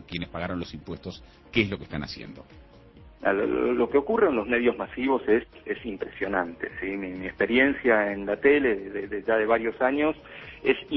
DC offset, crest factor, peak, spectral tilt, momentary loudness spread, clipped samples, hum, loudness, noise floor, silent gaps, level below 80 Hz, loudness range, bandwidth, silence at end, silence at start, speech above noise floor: under 0.1%; 20 dB; -6 dBFS; -7 dB/octave; 16 LU; under 0.1%; none; -26 LUFS; -50 dBFS; none; -52 dBFS; 6 LU; 6 kHz; 0 s; 0 s; 24 dB